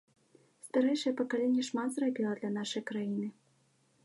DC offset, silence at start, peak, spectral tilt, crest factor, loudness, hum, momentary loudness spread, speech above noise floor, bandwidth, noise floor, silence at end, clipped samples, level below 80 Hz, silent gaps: under 0.1%; 0.65 s; -18 dBFS; -5 dB/octave; 16 dB; -33 LUFS; none; 7 LU; 38 dB; 11.5 kHz; -71 dBFS; 0.75 s; under 0.1%; -88 dBFS; none